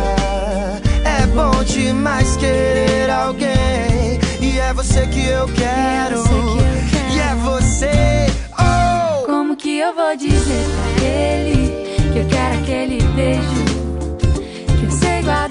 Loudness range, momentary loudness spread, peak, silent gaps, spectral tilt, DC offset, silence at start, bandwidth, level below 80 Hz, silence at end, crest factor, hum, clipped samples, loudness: 2 LU; 4 LU; -2 dBFS; none; -5.5 dB/octave; under 0.1%; 0 s; 10.5 kHz; -22 dBFS; 0 s; 12 dB; none; under 0.1%; -16 LUFS